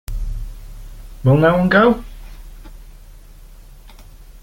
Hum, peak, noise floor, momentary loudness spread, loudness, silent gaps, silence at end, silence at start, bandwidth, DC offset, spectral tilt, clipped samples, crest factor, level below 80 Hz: none; -2 dBFS; -40 dBFS; 26 LU; -15 LUFS; none; 0.05 s; 0.1 s; 17 kHz; under 0.1%; -8 dB/octave; under 0.1%; 18 dB; -32 dBFS